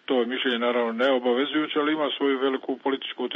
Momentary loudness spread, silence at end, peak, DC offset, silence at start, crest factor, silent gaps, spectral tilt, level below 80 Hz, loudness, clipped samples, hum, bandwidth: 5 LU; 0 s; -10 dBFS; under 0.1%; 0.1 s; 14 dB; none; -5.5 dB/octave; -78 dBFS; -25 LUFS; under 0.1%; none; 6.4 kHz